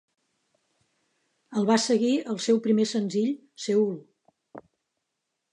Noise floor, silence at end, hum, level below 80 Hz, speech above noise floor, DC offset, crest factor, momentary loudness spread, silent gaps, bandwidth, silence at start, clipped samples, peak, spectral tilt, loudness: -82 dBFS; 0.95 s; none; -82 dBFS; 57 dB; under 0.1%; 20 dB; 9 LU; none; 11 kHz; 1.5 s; under 0.1%; -8 dBFS; -5 dB/octave; -25 LUFS